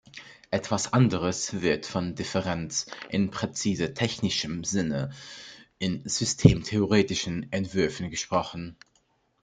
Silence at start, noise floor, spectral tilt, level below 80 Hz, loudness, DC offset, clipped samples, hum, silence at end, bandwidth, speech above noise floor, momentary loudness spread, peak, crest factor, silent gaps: 0.15 s; -69 dBFS; -5 dB/octave; -50 dBFS; -27 LUFS; under 0.1%; under 0.1%; none; 0.7 s; 9.6 kHz; 42 dB; 13 LU; -2 dBFS; 26 dB; none